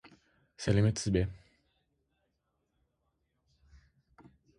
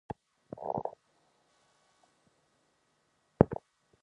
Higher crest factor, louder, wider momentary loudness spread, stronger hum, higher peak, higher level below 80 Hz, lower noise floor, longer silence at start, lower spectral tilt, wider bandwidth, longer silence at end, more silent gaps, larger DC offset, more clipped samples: second, 22 dB vs 34 dB; about the same, -31 LUFS vs -33 LUFS; second, 10 LU vs 19 LU; neither; second, -14 dBFS vs -4 dBFS; first, -52 dBFS vs -58 dBFS; first, -80 dBFS vs -74 dBFS; second, 0.05 s vs 0.55 s; second, -6 dB/octave vs -10.5 dB/octave; first, 11.5 kHz vs 10 kHz; first, 3.2 s vs 0.5 s; neither; neither; neither